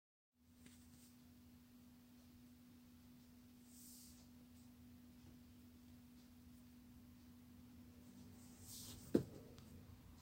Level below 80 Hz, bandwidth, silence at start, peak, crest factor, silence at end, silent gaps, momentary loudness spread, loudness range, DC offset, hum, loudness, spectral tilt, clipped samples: -74 dBFS; 16 kHz; 0.35 s; -20 dBFS; 36 dB; 0 s; none; 11 LU; 14 LU; under 0.1%; none; -56 LUFS; -5.5 dB/octave; under 0.1%